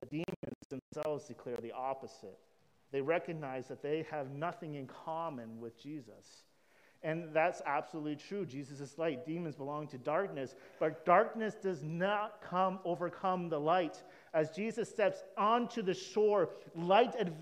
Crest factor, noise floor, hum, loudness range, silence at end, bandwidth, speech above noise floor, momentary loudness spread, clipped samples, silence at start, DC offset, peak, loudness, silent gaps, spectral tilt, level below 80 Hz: 22 dB; -68 dBFS; none; 8 LU; 0 s; 14.5 kHz; 32 dB; 15 LU; under 0.1%; 0 s; under 0.1%; -14 dBFS; -36 LUFS; 0.36-0.43 s, 0.55-0.70 s, 0.82-0.92 s; -6 dB/octave; -80 dBFS